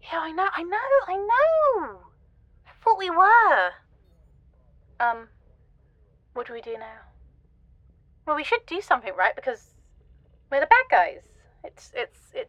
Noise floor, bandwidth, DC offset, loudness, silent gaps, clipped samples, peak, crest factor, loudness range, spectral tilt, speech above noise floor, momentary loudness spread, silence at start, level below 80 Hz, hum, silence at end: -59 dBFS; 9.8 kHz; under 0.1%; -22 LUFS; none; under 0.1%; -2 dBFS; 24 dB; 13 LU; -4 dB/octave; 36 dB; 19 LU; 0.05 s; -58 dBFS; none; 0.05 s